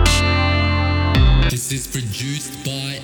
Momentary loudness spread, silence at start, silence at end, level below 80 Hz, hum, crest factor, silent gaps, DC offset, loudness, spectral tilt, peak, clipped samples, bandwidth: 10 LU; 0 s; 0 s; -22 dBFS; none; 16 dB; none; under 0.1%; -18 LUFS; -4.5 dB/octave; -2 dBFS; under 0.1%; 19.5 kHz